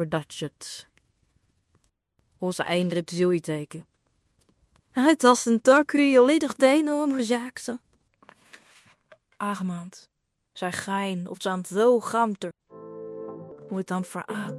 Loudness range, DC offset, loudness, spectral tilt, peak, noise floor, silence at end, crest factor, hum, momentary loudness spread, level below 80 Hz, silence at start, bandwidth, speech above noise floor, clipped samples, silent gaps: 12 LU; under 0.1%; -24 LUFS; -5 dB/octave; -2 dBFS; -70 dBFS; 0 s; 24 dB; none; 20 LU; -72 dBFS; 0 s; 14.5 kHz; 47 dB; under 0.1%; none